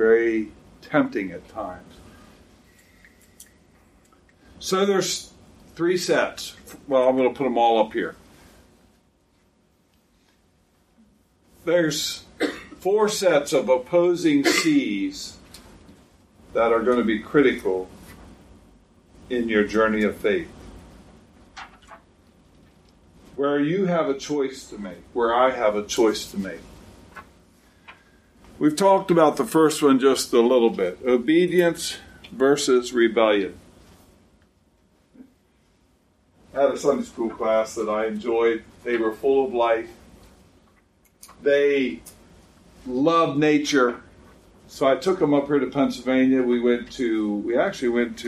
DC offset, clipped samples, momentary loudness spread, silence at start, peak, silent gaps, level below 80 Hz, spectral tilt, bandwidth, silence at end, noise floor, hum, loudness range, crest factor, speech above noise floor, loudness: under 0.1%; under 0.1%; 15 LU; 0 s; -2 dBFS; none; -56 dBFS; -4.5 dB/octave; 15.5 kHz; 0 s; -63 dBFS; none; 9 LU; 20 dB; 41 dB; -22 LUFS